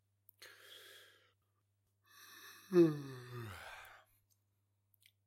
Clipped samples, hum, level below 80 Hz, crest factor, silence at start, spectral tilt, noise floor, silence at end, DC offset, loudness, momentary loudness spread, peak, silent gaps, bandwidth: under 0.1%; none; -82 dBFS; 24 dB; 0.4 s; -7 dB/octave; -81 dBFS; 1.4 s; under 0.1%; -36 LUFS; 27 LU; -18 dBFS; none; 16.5 kHz